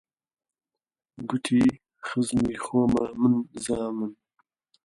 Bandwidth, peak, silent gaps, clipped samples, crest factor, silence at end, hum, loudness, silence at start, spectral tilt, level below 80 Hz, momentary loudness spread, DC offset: 11.5 kHz; -10 dBFS; none; under 0.1%; 18 dB; 0.7 s; none; -26 LUFS; 1.2 s; -6 dB/octave; -54 dBFS; 11 LU; under 0.1%